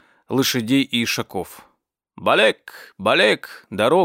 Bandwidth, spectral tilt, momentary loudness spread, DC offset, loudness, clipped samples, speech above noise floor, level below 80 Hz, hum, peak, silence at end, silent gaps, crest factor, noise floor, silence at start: 16 kHz; -4 dB/octave; 16 LU; under 0.1%; -19 LUFS; under 0.1%; 48 dB; -66 dBFS; none; -2 dBFS; 0 s; none; 18 dB; -67 dBFS; 0.3 s